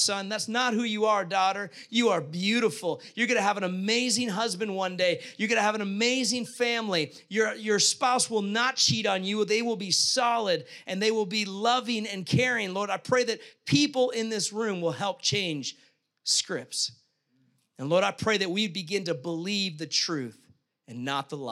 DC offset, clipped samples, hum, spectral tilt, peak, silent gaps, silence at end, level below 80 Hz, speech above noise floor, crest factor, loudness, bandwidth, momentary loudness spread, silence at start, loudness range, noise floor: under 0.1%; under 0.1%; none; -3 dB/octave; -10 dBFS; none; 0 s; -72 dBFS; 42 dB; 18 dB; -27 LUFS; 14.5 kHz; 8 LU; 0 s; 4 LU; -70 dBFS